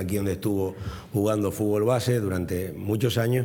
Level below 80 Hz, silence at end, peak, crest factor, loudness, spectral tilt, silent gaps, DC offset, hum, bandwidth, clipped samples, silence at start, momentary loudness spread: -52 dBFS; 0 s; -10 dBFS; 16 dB; -26 LUFS; -6.5 dB/octave; none; under 0.1%; none; 19.5 kHz; under 0.1%; 0 s; 7 LU